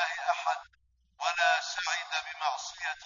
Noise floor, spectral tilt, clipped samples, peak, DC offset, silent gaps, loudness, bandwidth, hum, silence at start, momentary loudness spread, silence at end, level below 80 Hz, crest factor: -61 dBFS; 4 dB/octave; under 0.1%; -12 dBFS; under 0.1%; none; -31 LUFS; 7.4 kHz; none; 0 s; 8 LU; 0 s; -74 dBFS; 20 dB